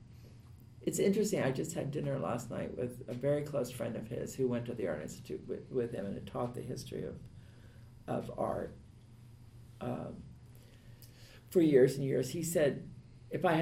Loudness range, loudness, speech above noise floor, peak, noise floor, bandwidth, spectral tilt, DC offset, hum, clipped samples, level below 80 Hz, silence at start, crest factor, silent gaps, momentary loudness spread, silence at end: 10 LU; -35 LUFS; 21 dB; -14 dBFS; -56 dBFS; 16 kHz; -6 dB/octave; under 0.1%; none; under 0.1%; -62 dBFS; 0 s; 22 dB; none; 25 LU; 0 s